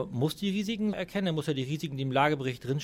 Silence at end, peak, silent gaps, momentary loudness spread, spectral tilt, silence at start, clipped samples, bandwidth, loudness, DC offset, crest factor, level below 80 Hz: 0 s; -10 dBFS; none; 6 LU; -6 dB/octave; 0 s; under 0.1%; 16.5 kHz; -30 LUFS; under 0.1%; 20 dB; -60 dBFS